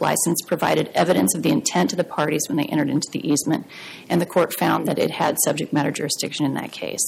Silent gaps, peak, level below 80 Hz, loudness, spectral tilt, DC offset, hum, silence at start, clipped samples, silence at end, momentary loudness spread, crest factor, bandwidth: none; -6 dBFS; -64 dBFS; -21 LUFS; -4 dB/octave; under 0.1%; none; 0 s; under 0.1%; 0 s; 5 LU; 14 dB; 16.5 kHz